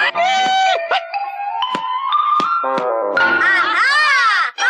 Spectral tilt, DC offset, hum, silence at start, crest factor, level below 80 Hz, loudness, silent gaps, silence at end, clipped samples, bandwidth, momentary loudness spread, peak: -1.5 dB/octave; under 0.1%; none; 0 s; 12 dB; -70 dBFS; -15 LUFS; none; 0 s; under 0.1%; 10.5 kHz; 9 LU; -4 dBFS